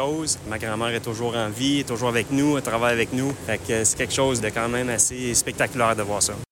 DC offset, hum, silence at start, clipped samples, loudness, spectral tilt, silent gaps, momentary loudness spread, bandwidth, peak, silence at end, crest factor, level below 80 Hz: under 0.1%; none; 0 s; under 0.1%; -23 LUFS; -3.5 dB/octave; none; 5 LU; 17 kHz; -6 dBFS; 0.1 s; 18 dB; -48 dBFS